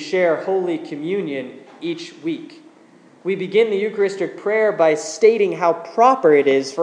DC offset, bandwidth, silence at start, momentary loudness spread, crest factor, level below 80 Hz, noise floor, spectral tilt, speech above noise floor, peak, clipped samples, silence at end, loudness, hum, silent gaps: under 0.1%; 10 kHz; 0 s; 13 LU; 18 dB; -82 dBFS; -49 dBFS; -5 dB/octave; 31 dB; 0 dBFS; under 0.1%; 0 s; -19 LUFS; none; none